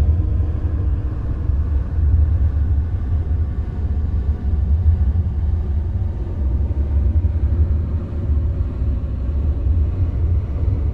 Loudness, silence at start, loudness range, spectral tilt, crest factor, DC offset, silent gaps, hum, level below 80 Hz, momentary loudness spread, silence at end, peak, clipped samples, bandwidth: -21 LUFS; 0 s; 1 LU; -11 dB/octave; 12 dB; under 0.1%; none; none; -20 dBFS; 6 LU; 0 s; -6 dBFS; under 0.1%; 2.7 kHz